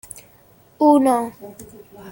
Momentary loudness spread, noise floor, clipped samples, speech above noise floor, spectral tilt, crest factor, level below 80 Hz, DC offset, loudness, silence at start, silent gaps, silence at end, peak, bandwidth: 25 LU; -52 dBFS; under 0.1%; 33 dB; -5.5 dB/octave; 18 dB; -60 dBFS; under 0.1%; -17 LUFS; 0.8 s; none; 0 s; -4 dBFS; 17 kHz